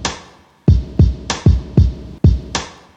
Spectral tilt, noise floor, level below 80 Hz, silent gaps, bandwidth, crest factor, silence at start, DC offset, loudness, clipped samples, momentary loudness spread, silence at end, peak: -6 dB/octave; -43 dBFS; -20 dBFS; none; 9 kHz; 16 dB; 0 s; under 0.1%; -16 LUFS; under 0.1%; 10 LU; 0.25 s; 0 dBFS